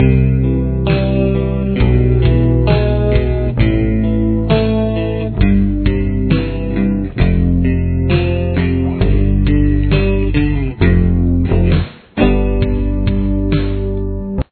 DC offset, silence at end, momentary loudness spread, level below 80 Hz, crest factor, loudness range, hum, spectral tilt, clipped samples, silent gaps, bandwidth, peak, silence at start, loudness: under 0.1%; 0.1 s; 4 LU; -18 dBFS; 12 dB; 2 LU; none; -12 dB/octave; under 0.1%; none; 4.5 kHz; 0 dBFS; 0 s; -15 LUFS